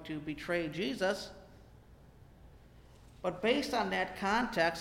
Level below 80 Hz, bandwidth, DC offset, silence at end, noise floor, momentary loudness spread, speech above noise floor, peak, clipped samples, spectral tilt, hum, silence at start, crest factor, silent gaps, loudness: -58 dBFS; 16.5 kHz; under 0.1%; 0 s; -57 dBFS; 9 LU; 24 dB; -18 dBFS; under 0.1%; -4.5 dB/octave; none; 0 s; 18 dB; none; -34 LUFS